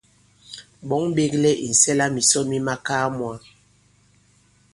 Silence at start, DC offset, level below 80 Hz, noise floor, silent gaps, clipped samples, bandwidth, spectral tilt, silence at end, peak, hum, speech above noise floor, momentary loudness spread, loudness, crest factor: 0.5 s; under 0.1%; -58 dBFS; -58 dBFS; none; under 0.1%; 11.5 kHz; -3 dB/octave; 1.35 s; -4 dBFS; none; 38 dB; 23 LU; -20 LUFS; 20 dB